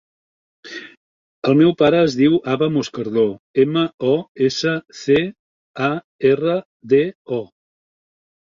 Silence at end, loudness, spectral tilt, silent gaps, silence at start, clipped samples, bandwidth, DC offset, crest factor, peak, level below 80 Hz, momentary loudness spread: 1.1 s; -18 LUFS; -6.5 dB/octave; 0.97-1.42 s, 3.39-3.54 s, 3.94-3.98 s, 4.28-4.35 s, 5.39-5.74 s, 6.04-6.19 s, 6.65-6.80 s, 7.15-7.25 s; 0.65 s; under 0.1%; 7.4 kHz; under 0.1%; 16 dB; -2 dBFS; -58 dBFS; 12 LU